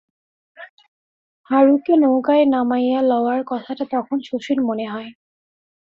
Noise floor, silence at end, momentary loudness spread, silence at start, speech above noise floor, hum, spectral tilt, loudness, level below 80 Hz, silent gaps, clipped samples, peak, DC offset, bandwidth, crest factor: under -90 dBFS; 0.85 s; 11 LU; 0.6 s; over 72 dB; none; -6.5 dB/octave; -18 LUFS; -68 dBFS; 0.69-0.77 s, 0.88-1.44 s; under 0.1%; -2 dBFS; under 0.1%; 7 kHz; 18 dB